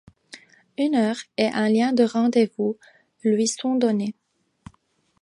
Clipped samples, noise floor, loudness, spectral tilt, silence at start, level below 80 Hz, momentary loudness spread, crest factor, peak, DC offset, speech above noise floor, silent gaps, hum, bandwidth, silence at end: under 0.1%; -66 dBFS; -22 LUFS; -5 dB/octave; 0.35 s; -66 dBFS; 8 LU; 18 dB; -6 dBFS; under 0.1%; 45 dB; none; none; 11 kHz; 1.1 s